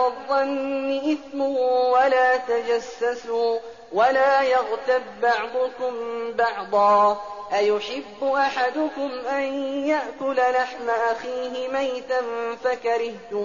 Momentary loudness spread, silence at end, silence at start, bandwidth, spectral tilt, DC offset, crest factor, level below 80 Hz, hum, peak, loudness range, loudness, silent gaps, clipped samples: 9 LU; 0 s; 0 s; 7.2 kHz; -1 dB/octave; 0.2%; 14 dB; -64 dBFS; none; -8 dBFS; 3 LU; -23 LUFS; none; under 0.1%